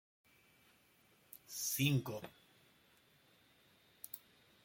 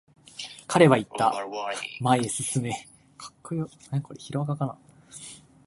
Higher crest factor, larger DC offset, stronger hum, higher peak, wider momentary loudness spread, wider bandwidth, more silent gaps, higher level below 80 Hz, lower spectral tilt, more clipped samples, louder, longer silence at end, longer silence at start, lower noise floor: about the same, 24 dB vs 24 dB; neither; neither; second, -22 dBFS vs -4 dBFS; about the same, 22 LU vs 23 LU; first, 17 kHz vs 11.5 kHz; neither; second, -78 dBFS vs -64 dBFS; about the same, -4 dB/octave vs -5 dB/octave; neither; second, -40 LUFS vs -26 LUFS; first, 0.45 s vs 0.3 s; first, 1.35 s vs 0.35 s; first, -71 dBFS vs -48 dBFS